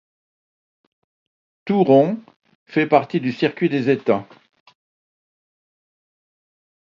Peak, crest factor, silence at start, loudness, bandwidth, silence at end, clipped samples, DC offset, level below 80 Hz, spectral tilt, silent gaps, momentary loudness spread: 0 dBFS; 22 dB; 1.65 s; -19 LUFS; 7.2 kHz; 2.7 s; under 0.1%; under 0.1%; -70 dBFS; -8.5 dB/octave; 2.36-2.40 s, 2.55-2.66 s; 9 LU